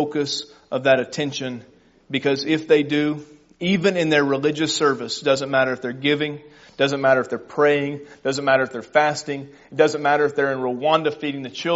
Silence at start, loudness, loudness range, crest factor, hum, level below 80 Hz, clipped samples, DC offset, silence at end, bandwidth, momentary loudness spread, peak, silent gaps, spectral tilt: 0 s; -21 LUFS; 2 LU; 18 dB; none; -64 dBFS; under 0.1%; under 0.1%; 0 s; 8 kHz; 10 LU; -2 dBFS; none; -3 dB/octave